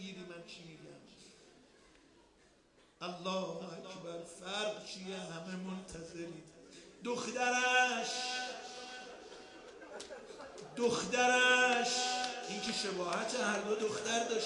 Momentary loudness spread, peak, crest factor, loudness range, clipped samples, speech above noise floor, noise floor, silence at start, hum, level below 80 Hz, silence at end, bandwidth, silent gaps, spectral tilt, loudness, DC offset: 22 LU; -16 dBFS; 20 dB; 14 LU; under 0.1%; 32 dB; -67 dBFS; 0 s; none; -74 dBFS; 0 s; 11.5 kHz; none; -2 dB/octave; -35 LUFS; under 0.1%